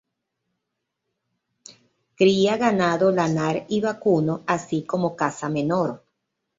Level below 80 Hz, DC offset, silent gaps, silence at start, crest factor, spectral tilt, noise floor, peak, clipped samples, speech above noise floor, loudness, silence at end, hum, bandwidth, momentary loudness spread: -64 dBFS; under 0.1%; none; 2.2 s; 18 dB; -6 dB/octave; -80 dBFS; -4 dBFS; under 0.1%; 59 dB; -22 LUFS; 0.6 s; none; 7.8 kHz; 6 LU